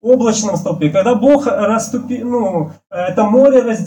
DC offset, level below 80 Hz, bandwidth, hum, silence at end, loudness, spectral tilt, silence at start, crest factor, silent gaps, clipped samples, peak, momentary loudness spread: under 0.1%; -54 dBFS; 18.5 kHz; none; 0 s; -14 LUFS; -5.5 dB/octave; 0.05 s; 12 dB; none; under 0.1%; 0 dBFS; 10 LU